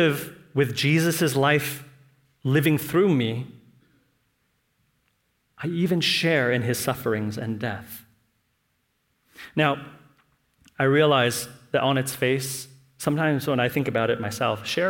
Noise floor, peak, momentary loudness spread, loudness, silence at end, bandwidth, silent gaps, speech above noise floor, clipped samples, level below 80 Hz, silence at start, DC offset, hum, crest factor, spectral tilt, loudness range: -72 dBFS; -6 dBFS; 12 LU; -24 LUFS; 0 s; 17 kHz; none; 49 dB; under 0.1%; -64 dBFS; 0 s; under 0.1%; none; 20 dB; -5 dB/octave; 6 LU